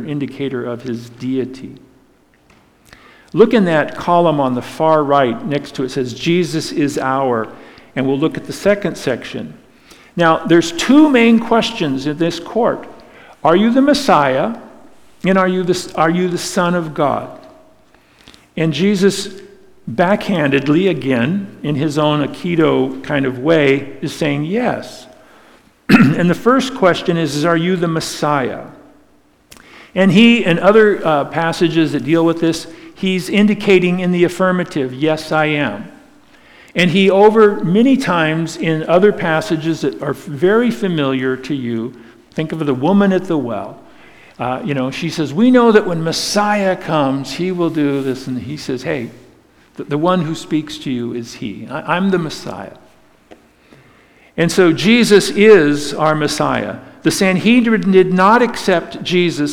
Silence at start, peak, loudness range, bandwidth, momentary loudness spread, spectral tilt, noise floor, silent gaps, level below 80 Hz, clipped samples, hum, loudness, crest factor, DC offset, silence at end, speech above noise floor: 0 s; 0 dBFS; 7 LU; 16.5 kHz; 13 LU; -5.5 dB/octave; -52 dBFS; none; -52 dBFS; under 0.1%; none; -15 LUFS; 16 dB; under 0.1%; 0 s; 38 dB